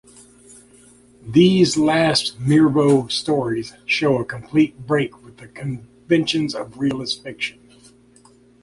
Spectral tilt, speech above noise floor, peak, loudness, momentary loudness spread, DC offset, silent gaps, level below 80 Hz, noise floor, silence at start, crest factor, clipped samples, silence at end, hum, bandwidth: -5.5 dB/octave; 33 dB; -2 dBFS; -19 LUFS; 13 LU; under 0.1%; none; -54 dBFS; -51 dBFS; 1.25 s; 18 dB; under 0.1%; 1.15 s; 60 Hz at -40 dBFS; 11.5 kHz